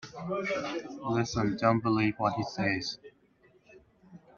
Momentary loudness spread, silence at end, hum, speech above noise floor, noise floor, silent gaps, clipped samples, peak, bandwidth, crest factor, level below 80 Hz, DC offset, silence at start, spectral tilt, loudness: 10 LU; 0.2 s; none; 34 dB; -64 dBFS; none; under 0.1%; -10 dBFS; 7.2 kHz; 22 dB; -60 dBFS; under 0.1%; 0 s; -6 dB/octave; -30 LUFS